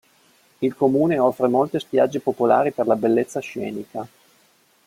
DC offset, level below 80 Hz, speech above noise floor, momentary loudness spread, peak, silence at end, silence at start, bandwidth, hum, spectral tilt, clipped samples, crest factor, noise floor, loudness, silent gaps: under 0.1%; -64 dBFS; 39 dB; 12 LU; -4 dBFS; 0.8 s; 0.6 s; 16.5 kHz; none; -7 dB/octave; under 0.1%; 18 dB; -59 dBFS; -21 LUFS; none